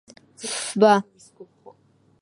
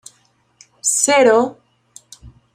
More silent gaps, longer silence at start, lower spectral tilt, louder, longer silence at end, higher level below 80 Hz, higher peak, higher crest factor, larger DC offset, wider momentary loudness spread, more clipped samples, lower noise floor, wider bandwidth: neither; second, 0.4 s vs 0.85 s; first, -4 dB/octave vs -1.5 dB/octave; second, -20 LUFS vs -15 LUFS; first, 0.8 s vs 0.25 s; second, -76 dBFS vs -56 dBFS; second, -4 dBFS vs 0 dBFS; about the same, 22 dB vs 18 dB; neither; first, 18 LU vs 10 LU; neither; about the same, -60 dBFS vs -59 dBFS; second, 11.5 kHz vs 15.5 kHz